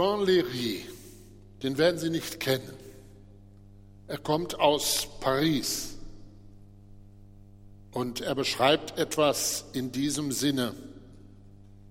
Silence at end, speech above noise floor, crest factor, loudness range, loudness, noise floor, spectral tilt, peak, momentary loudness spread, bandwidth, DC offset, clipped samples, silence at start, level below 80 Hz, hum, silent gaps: 0 s; 23 dB; 22 dB; 4 LU; -28 LUFS; -51 dBFS; -3.5 dB/octave; -8 dBFS; 20 LU; 16.5 kHz; under 0.1%; under 0.1%; 0 s; -54 dBFS; 50 Hz at -55 dBFS; none